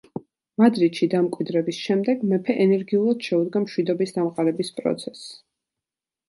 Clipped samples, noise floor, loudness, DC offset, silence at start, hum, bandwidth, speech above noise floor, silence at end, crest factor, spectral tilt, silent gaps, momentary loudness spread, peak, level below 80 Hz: under 0.1%; -89 dBFS; -22 LUFS; under 0.1%; 0.15 s; none; 11.5 kHz; 67 dB; 0.95 s; 18 dB; -6.5 dB/octave; none; 14 LU; -4 dBFS; -72 dBFS